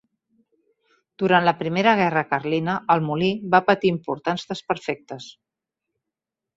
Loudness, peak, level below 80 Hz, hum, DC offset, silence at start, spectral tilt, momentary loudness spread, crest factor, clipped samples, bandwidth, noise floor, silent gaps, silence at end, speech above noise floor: -21 LUFS; -2 dBFS; -64 dBFS; none; under 0.1%; 1.2 s; -6.5 dB/octave; 12 LU; 20 dB; under 0.1%; 8 kHz; -86 dBFS; none; 1.25 s; 65 dB